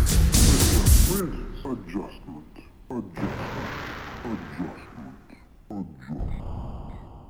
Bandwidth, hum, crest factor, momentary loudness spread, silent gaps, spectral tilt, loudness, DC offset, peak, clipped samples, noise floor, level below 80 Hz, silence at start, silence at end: over 20 kHz; none; 20 dB; 23 LU; none; -4.5 dB/octave; -25 LUFS; 0.1%; -6 dBFS; under 0.1%; -50 dBFS; -28 dBFS; 0 s; 0 s